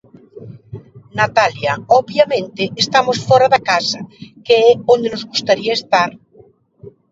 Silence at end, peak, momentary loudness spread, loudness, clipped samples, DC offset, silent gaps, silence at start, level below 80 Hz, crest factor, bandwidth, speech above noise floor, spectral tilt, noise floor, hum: 0.2 s; 0 dBFS; 19 LU; -15 LUFS; under 0.1%; under 0.1%; none; 0.35 s; -56 dBFS; 16 dB; 7.8 kHz; 34 dB; -4 dB/octave; -48 dBFS; none